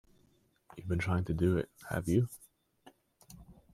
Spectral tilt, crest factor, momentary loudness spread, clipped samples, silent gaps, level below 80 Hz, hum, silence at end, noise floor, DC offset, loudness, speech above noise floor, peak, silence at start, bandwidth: -7.5 dB/octave; 18 dB; 24 LU; under 0.1%; none; -56 dBFS; none; 0.2 s; -70 dBFS; under 0.1%; -33 LUFS; 38 dB; -16 dBFS; 0.75 s; 15.5 kHz